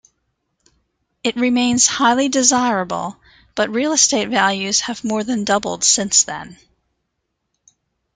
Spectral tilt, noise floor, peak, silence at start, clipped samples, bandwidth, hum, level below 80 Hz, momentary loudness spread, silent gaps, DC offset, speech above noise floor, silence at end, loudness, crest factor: -1.5 dB/octave; -74 dBFS; 0 dBFS; 1.25 s; under 0.1%; 10.5 kHz; none; -56 dBFS; 11 LU; none; under 0.1%; 57 dB; 1.6 s; -16 LUFS; 20 dB